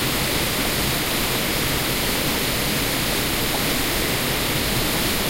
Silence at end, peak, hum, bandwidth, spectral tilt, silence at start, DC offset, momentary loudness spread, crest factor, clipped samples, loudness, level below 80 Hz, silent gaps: 0 s; -10 dBFS; none; 16 kHz; -3 dB/octave; 0 s; under 0.1%; 0 LU; 12 dB; under 0.1%; -20 LUFS; -34 dBFS; none